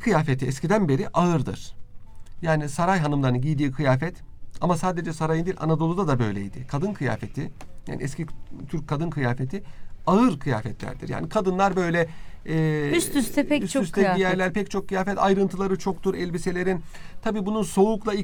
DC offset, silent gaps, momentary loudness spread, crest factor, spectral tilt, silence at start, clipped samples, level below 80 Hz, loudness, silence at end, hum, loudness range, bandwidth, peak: under 0.1%; none; 11 LU; 18 dB; -6.5 dB/octave; 0 s; under 0.1%; -42 dBFS; -25 LUFS; 0 s; none; 5 LU; 19.5 kHz; -6 dBFS